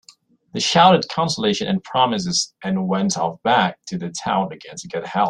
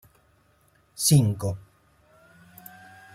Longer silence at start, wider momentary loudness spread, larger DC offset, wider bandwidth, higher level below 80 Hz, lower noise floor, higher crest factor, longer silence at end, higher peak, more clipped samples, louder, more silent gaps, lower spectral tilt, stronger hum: second, 0.55 s vs 1 s; second, 14 LU vs 27 LU; neither; second, 11 kHz vs 16.5 kHz; about the same, -58 dBFS vs -56 dBFS; second, -52 dBFS vs -63 dBFS; about the same, 18 dB vs 20 dB; second, 0 s vs 1.55 s; first, -2 dBFS vs -8 dBFS; neither; first, -19 LUFS vs -23 LUFS; neither; about the same, -4 dB/octave vs -5 dB/octave; neither